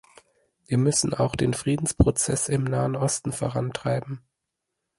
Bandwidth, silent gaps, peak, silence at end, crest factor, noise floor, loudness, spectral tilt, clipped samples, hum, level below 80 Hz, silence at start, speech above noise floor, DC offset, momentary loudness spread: 11.5 kHz; none; -6 dBFS; 0.8 s; 20 dB; -82 dBFS; -24 LUFS; -5 dB/octave; under 0.1%; none; -40 dBFS; 0.7 s; 58 dB; under 0.1%; 7 LU